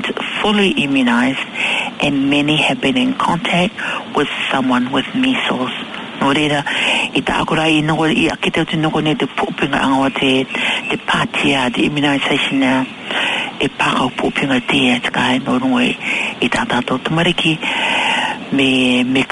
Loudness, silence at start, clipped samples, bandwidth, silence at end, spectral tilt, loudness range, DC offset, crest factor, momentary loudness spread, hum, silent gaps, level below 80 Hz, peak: -15 LUFS; 0 s; under 0.1%; 11 kHz; 0 s; -4.5 dB/octave; 1 LU; under 0.1%; 14 dB; 5 LU; none; none; -46 dBFS; -2 dBFS